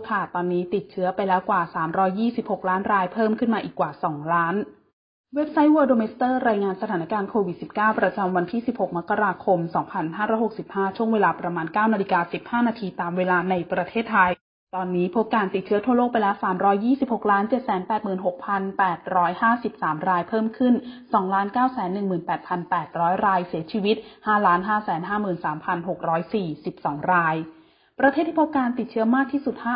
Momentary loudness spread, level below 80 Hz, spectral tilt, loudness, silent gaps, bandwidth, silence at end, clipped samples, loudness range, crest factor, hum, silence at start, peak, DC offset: 7 LU; -62 dBFS; -11 dB/octave; -23 LUFS; 4.93-5.24 s, 14.41-14.67 s; 5.2 kHz; 0 s; under 0.1%; 2 LU; 18 dB; none; 0 s; -6 dBFS; under 0.1%